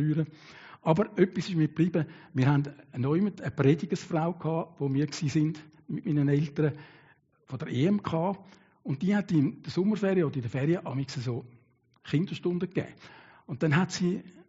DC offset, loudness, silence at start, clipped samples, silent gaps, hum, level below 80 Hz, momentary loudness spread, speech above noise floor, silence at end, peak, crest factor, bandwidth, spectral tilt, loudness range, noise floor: under 0.1%; -29 LUFS; 0 s; under 0.1%; none; none; -66 dBFS; 11 LU; 33 dB; 0.05 s; -10 dBFS; 20 dB; 7.6 kHz; -7 dB/octave; 3 LU; -62 dBFS